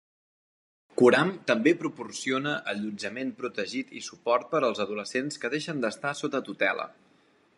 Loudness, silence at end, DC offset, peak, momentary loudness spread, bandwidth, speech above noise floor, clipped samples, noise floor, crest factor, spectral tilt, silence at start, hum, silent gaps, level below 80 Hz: -28 LUFS; 0.65 s; under 0.1%; -6 dBFS; 11 LU; 11.5 kHz; 36 dB; under 0.1%; -63 dBFS; 22 dB; -4.5 dB/octave; 0.95 s; none; none; -78 dBFS